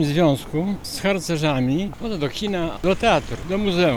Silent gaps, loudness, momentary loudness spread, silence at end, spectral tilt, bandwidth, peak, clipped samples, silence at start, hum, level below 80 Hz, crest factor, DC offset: none; -22 LUFS; 7 LU; 0 s; -5.5 dB/octave; 19.5 kHz; -4 dBFS; under 0.1%; 0 s; none; -40 dBFS; 16 dB; under 0.1%